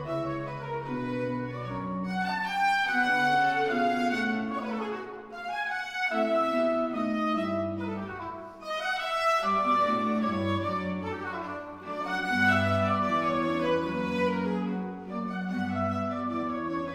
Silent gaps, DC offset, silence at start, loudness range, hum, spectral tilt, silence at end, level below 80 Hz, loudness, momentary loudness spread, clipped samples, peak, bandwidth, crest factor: none; under 0.1%; 0 s; 2 LU; none; -6 dB/octave; 0 s; -62 dBFS; -29 LUFS; 11 LU; under 0.1%; -12 dBFS; 16 kHz; 16 dB